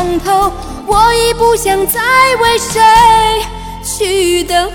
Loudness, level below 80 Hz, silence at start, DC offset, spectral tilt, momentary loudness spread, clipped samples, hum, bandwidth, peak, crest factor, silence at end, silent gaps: -10 LUFS; -28 dBFS; 0 s; under 0.1%; -2.5 dB/octave; 11 LU; under 0.1%; none; 19.5 kHz; 0 dBFS; 10 dB; 0 s; none